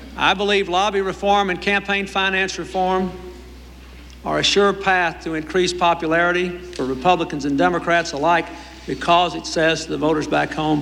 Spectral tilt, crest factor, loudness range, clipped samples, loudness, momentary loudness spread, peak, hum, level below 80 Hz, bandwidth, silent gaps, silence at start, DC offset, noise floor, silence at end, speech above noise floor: -4 dB/octave; 16 dB; 2 LU; under 0.1%; -19 LUFS; 9 LU; -4 dBFS; none; -42 dBFS; 16 kHz; none; 0 s; under 0.1%; -39 dBFS; 0 s; 20 dB